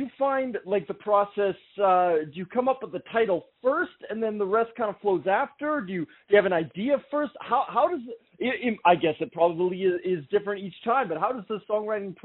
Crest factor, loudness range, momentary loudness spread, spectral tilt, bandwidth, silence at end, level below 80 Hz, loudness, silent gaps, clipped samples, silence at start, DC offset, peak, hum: 20 dB; 2 LU; 8 LU; -4 dB/octave; 4.1 kHz; 0.1 s; -70 dBFS; -26 LUFS; none; under 0.1%; 0 s; under 0.1%; -6 dBFS; none